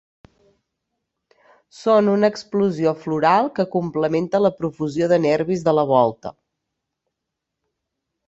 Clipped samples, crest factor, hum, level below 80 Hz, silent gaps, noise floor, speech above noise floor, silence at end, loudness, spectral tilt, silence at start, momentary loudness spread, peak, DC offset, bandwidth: under 0.1%; 18 dB; none; -62 dBFS; none; -81 dBFS; 63 dB; 1.95 s; -19 LUFS; -7 dB/octave; 1.8 s; 7 LU; -2 dBFS; under 0.1%; 8 kHz